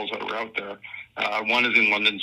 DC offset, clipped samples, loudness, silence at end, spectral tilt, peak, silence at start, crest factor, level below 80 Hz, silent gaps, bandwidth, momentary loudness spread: under 0.1%; under 0.1%; -22 LUFS; 0 s; -3 dB/octave; -6 dBFS; 0 s; 20 dB; -68 dBFS; none; 13.5 kHz; 19 LU